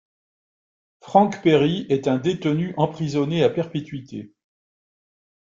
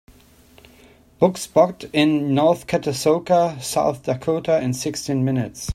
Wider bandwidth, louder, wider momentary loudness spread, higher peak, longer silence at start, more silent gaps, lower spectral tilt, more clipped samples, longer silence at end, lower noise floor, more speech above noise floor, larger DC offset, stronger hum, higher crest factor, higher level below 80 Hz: second, 7.6 kHz vs 15 kHz; about the same, -21 LUFS vs -20 LUFS; first, 15 LU vs 6 LU; about the same, -2 dBFS vs -2 dBFS; second, 1.05 s vs 1.2 s; neither; first, -7 dB/octave vs -5.5 dB/octave; neither; first, 1.2 s vs 0 s; first, under -90 dBFS vs -50 dBFS; first, over 69 dB vs 31 dB; neither; neither; about the same, 20 dB vs 20 dB; second, -60 dBFS vs -54 dBFS